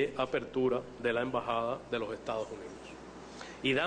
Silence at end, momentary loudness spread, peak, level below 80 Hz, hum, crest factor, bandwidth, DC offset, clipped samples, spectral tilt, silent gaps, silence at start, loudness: 0 s; 15 LU; -18 dBFS; -62 dBFS; none; 16 dB; 10 kHz; under 0.1%; under 0.1%; -5.5 dB/octave; none; 0 s; -34 LUFS